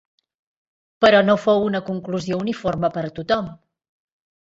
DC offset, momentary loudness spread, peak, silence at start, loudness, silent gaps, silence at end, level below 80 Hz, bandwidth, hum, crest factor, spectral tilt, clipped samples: under 0.1%; 11 LU; -2 dBFS; 1 s; -20 LUFS; none; 0.85 s; -54 dBFS; 7.8 kHz; none; 20 dB; -6 dB/octave; under 0.1%